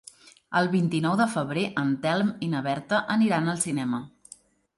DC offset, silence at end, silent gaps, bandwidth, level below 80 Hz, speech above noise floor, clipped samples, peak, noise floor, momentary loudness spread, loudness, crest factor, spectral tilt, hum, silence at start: under 0.1%; 0.7 s; none; 11.5 kHz; -66 dBFS; 28 dB; under 0.1%; -10 dBFS; -53 dBFS; 6 LU; -26 LUFS; 16 dB; -5.5 dB/octave; none; 0.5 s